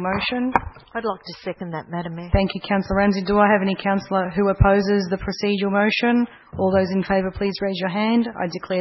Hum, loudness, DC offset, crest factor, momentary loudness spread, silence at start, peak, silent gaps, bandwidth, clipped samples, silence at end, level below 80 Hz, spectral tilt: none; -21 LUFS; under 0.1%; 20 dB; 12 LU; 0 s; 0 dBFS; none; 6 kHz; under 0.1%; 0 s; -36 dBFS; -7.5 dB/octave